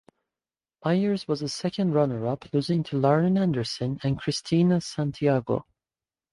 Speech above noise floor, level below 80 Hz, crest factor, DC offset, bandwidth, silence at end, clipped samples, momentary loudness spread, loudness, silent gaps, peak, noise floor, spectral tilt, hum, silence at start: over 65 dB; -58 dBFS; 18 dB; under 0.1%; 11.5 kHz; 0.7 s; under 0.1%; 7 LU; -26 LUFS; none; -8 dBFS; under -90 dBFS; -7 dB/octave; none; 0.85 s